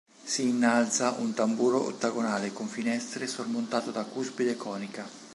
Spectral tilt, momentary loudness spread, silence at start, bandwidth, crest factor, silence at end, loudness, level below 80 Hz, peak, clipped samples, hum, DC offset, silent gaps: -3.5 dB/octave; 10 LU; 0.2 s; 11.5 kHz; 18 dB; 0 s; -29 LUFS; -80 dBFS; -10 dBFS; under 0.1%; none; under 0.1%; none